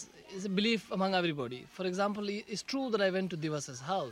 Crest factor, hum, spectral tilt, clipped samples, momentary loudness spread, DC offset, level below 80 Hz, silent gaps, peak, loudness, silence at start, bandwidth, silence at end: 18 dB; none; -5 dB/octave; under 0.1%; 8 LU; under 0.1%; -72 dBFS; none; -16 dBFS; -34 LUFS; 0 s; 14.5 kHz; 0 s